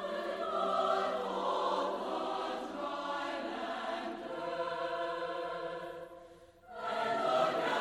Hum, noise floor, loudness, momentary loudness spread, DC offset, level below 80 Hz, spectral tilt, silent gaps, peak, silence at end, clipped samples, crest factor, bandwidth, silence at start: none; -56 dBFS; -36 LUFS; 10 LU; under 0.1%; -70 dBFS; -4 dB/octave; none; -18 dBFS; 0 s; under 0.1%; 18 dB; 13.5 kHz; 0 s